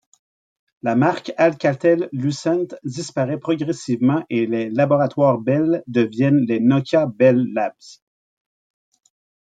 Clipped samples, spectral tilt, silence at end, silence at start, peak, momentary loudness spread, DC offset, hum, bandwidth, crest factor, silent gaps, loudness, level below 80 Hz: under 0.1%; -7 dB/octave; 1.5 s; 0.85 s; -4 dBFS; 7 LU; under 0.1%; none; 9.2 kHz; 16 dB; none; -19 LUFS; -66 dBFS